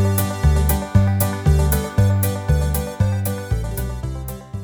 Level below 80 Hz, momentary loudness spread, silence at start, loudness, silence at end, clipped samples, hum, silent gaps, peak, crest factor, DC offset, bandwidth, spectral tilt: -24 dBFS; 10 LU; 0 s; -20 LUFS; 0 s; under 0.1%; none; none; -2 dBFS; 16 dB; under 0.1%; over 20 kHz; -6 dB/octave